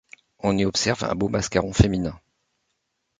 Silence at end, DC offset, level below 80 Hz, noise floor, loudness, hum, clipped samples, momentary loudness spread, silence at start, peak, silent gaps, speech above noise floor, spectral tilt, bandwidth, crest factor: 1.05 s; under 0.1%; -38 dBFS; -76 dBFS; -23 LUFS; none; under 0.1%; 8 LU; 0.45 s; -2 dBFS; none; 54 dB; -5 dB/octave; 9.6 kHz; 22 dB